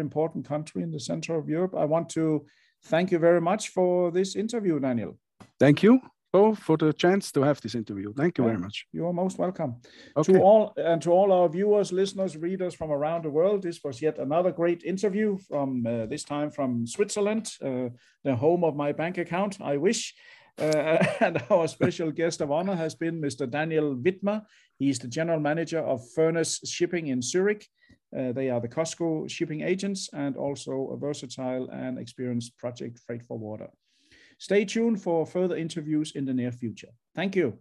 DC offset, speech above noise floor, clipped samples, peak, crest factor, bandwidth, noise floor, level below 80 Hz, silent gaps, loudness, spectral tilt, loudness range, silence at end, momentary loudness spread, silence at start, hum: under 0.1%; 33 dB; under 0.1%; -6 dBFS; 20 dB; 12 kHz; -59 dBFS; -70 dBFS; none; -27 LUFS; -6 dB/octave; 7 LU; 0.05 s; 12 LU; 0 s; none